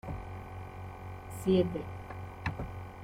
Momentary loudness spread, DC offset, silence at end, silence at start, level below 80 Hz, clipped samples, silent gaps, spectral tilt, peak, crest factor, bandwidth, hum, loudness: 16 LU; under 0.1%; 0 s; 0.05 s; -50 dBFS; under 0.1%; none; -7 dB/octave; -16 dBFS; 20 dB; 16 kHz; none; -36 LUFS